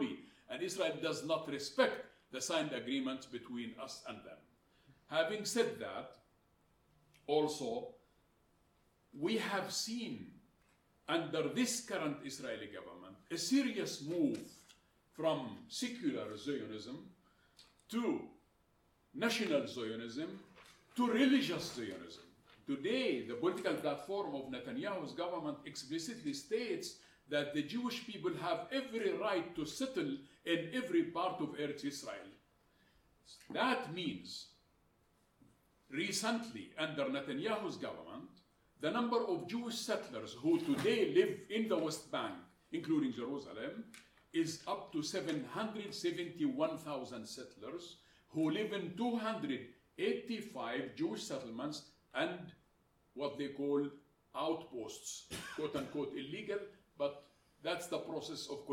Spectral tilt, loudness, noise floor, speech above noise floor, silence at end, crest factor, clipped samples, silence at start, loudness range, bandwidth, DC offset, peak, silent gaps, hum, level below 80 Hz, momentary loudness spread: -4 dB/octave; -39 LUFS; -74 dBFS; 35 dB; 0 s; 22 dB; under 0.1%; 0 s; 6 LU; 17 kHz; under 0.1%; -18 dBFS; none; none; -78 dBFS; 14 LU